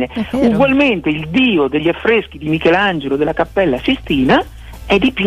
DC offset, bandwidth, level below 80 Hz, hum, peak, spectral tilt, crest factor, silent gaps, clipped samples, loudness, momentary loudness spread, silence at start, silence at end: under 0.1%; 13 kHz; -36 dBFS; none; -2 dBFS; -6.5 dB/octave; 12 dB; none; under 0.1%; -14 LUFS; 5 LU; 0 s; 0 s